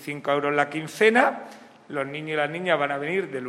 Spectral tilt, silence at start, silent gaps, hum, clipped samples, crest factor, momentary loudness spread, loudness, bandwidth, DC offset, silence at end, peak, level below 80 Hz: -5 dB/octave; 0 s; none; none; under 0.1%; 22 dB; 13 LU; -24 LUFS; 14.5 kHz; under 0.1%; 0 s; -2 dBFS; -76 dBFS